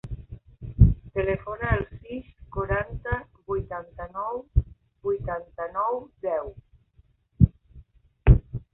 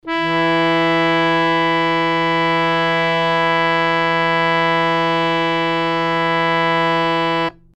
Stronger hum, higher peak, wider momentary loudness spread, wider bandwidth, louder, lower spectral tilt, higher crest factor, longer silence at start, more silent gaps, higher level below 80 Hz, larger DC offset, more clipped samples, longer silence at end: neither; about the same, -2 dBFS vs -4 dBFS; first, 18 LU vs 2 LU; second, 3.8 kHz vs 9.2 kHz; second, -27 LUFS vs -16 LUFS; first, -11.5 dB/octave vs -5.5 dB/octave; first, 24 dB vs 14 dB; about the same, 0.05 s vs 0.05 s; neither; first, -30 dBFS vs -52 dBFS; neither; neither; about the same, 0.15 s vs 0.25 s